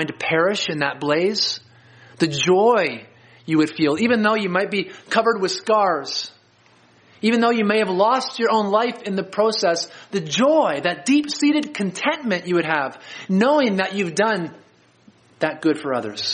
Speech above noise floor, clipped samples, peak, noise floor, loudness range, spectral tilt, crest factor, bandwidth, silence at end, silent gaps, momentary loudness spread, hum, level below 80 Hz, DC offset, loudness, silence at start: 35 dB; under 0.1%; -2 dBFS; -55 dBFS; 2 LU; -4.5 dB/octave; 18 dB; 10 kHz; 0 s; none; 8 LU; none; -68 dBFS; under 0.1%; -20 LUFS; 0 s